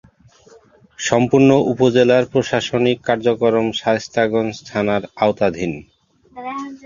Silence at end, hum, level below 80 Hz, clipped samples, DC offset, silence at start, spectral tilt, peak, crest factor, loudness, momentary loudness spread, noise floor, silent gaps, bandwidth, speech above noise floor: 0.1 s; none; -52 dBFS; under 0.1%; under 0.1%; 1 s; -5.5 dB/octave; 0 dBFS; 16 dB; -17 LUFS; 13 LU; -49 dBFS; none; 7.6 kHz; 32 dB